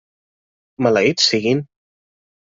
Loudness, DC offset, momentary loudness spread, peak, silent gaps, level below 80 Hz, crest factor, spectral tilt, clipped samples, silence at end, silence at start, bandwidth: -17 LUFS; under 0.1%; 7 LU; 0 dBFS; none; -62 dBFS; 20 dB; -4 dB/octave; under 0.1%; 0.85 s; 0.8 s; 7.8 kHz